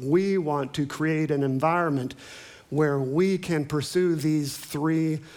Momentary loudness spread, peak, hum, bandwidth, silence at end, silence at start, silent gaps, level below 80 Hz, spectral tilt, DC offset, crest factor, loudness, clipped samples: 8 LU; -8 dBFS; none; 19.5 kHz; 0 s; 0 s; none; -62 dBFS; -6.5 dB/octave; under 0.1%; 16 dB; -25 LUFS; under 0.1%